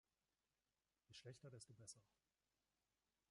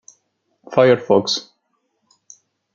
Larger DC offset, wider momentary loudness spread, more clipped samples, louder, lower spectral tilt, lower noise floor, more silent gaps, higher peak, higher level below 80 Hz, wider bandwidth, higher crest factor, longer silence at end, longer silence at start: neither; second, 5 LU vs 9 LU; neither; second, -63 LUFS vs -17 LUFS; about the same, -3.5 dB/octave vs -4.5 dB/octave; first, under -90 dBFS vs -70 dBFS; neither; second, -46 dBFS vs -2 dBFS; second, under -90 dBFS vs -66 dBFS; first, 11 kHz vs 7.6 kHz; about the same, 22 dB vs 18 dB; about the same, 1.25 s vs 1.35 s; first, 1.1 s vs 0.7 s